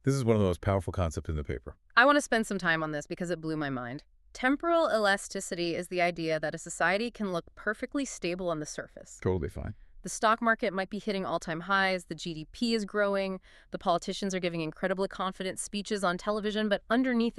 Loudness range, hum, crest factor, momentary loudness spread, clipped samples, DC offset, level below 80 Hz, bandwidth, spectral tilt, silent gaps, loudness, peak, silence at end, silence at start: 4 LU; none; 24 dB; 12 LU; under 0.1%; under 0.1%; -50 dBFS; 13.5 kHz; -5 dB/octave; none; -30 LUFS; -6 dBFS; 0.05 s; 0.05 s